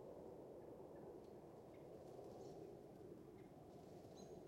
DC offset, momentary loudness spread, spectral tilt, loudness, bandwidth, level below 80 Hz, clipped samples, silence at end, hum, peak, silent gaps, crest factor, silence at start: under 0.1%; 4 LU; -7 dB/octave; -59 LUFS; 16 kHz; -80 dBFS; under 0.1%; 0 s; none; -46 dBFS; none; 14 dB; 0 s